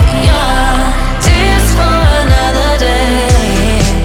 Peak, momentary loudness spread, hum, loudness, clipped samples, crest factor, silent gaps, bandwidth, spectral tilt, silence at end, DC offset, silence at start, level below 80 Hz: 0 dBFS; 3 LU; none; -10 LUFS; 0.1%; 8 dB; none; 16.5 kHz; -5 dB/octave; 0 s; under 0.1%; 0 s; -12 dBFS